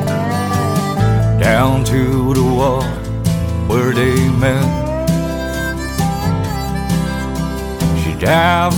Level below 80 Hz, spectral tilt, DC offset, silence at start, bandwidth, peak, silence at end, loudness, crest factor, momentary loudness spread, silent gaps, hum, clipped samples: -26 dBFS; -6 dB/octave; under 0.1%; 0 s; 18.5 kHz; 0 dBFS; 0 s; -16 LUFS; 14 dB; 7 LU; none; none; under 0.1%